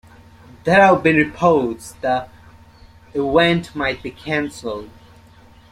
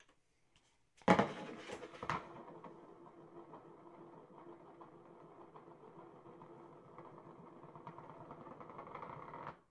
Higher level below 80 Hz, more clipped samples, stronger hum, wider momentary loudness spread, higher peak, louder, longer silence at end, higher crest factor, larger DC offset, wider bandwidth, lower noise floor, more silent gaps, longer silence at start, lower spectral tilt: first, -48 dBFS vs -76 dBFS; neither; neither; about the same, 16 LU vs 17 LU; first, -2 dBFS vs -12 dBFS; first, -18 LUFS vs -42 LUFS; first, 0.8 s vs 0.1 s; second, 18 dB vs 34 dB; neither; first, 15 kHz vs 11 kHz; second, -47 dBFS vs -75 dBFS; neither; first, 0.65 s vs 0 s; about the same, -6 dB/octave vs -6 dB/octave